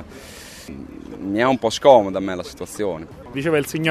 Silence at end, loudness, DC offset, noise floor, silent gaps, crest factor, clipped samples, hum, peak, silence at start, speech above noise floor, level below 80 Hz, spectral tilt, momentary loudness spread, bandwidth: 0 s; -19 LUFS; under 0.1%; -39 dBFS; none; 20 dB; under 0.1%; none; 0 dBFS; 0 s; 20 dB; -50 dBFS; -5 dB/octave; 23 LU; 13.5 kHz